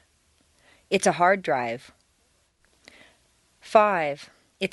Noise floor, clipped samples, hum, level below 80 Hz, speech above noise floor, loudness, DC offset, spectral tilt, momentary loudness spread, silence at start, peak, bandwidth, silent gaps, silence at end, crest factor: -67 dBFS; under 0.1%; none; -66 dBFS; 44 dB; -23 LUFS; under 0.1%; -4 dB/octave; 12 LU; 0.9 s; -2 dBFS; 11.5 kHz; none; 0.05 s; 24 dB